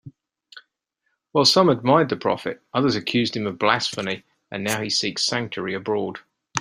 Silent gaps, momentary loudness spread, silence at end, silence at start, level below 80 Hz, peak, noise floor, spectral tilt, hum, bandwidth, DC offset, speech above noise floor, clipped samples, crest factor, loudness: none; 12 LU; 0 s; 0.05 s; -62 dBFS; -2 dBFS; -75 dBFS; -4 dB/octave; none; 16 kHz; under 0.1%; 53 dB; under 0.1%; 22 dB; -22 LUFS